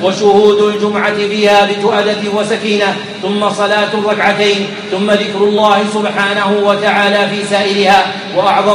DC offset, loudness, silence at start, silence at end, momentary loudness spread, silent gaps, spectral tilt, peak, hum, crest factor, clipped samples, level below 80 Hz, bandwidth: under 0.1%; -11 LUFS; 0 s; 0 s; 6 LU; none; -4.5 dB/octave; 0 dBFS; none; 12 dB; under 0.1%; -56 dBFS; 11.5 kHz